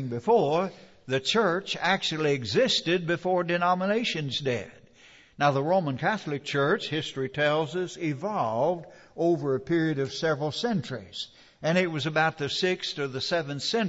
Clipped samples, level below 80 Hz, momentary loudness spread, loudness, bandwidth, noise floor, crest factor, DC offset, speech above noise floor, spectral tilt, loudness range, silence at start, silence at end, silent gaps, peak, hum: under 0.1%; -66 dBFS; 7 LU; -27 LUFS; 8 kHz; -55 dBFS; 16 dB; under 0.1%; 28 dB; -5 dB/octave; 3 LU; 0 s; 0 s; none; -10 dBFS; none